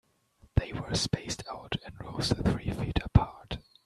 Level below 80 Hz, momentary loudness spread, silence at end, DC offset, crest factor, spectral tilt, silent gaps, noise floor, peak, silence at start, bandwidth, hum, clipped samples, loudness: -40 dBFS; 11 LU; 0.25 s; under 0.1%; 26 dB; -5.5 dB/octave; none; -63 dBFS; -6 dBFS; 0.55 s; 13 kHz; none; under 0.1%; -31 LUFS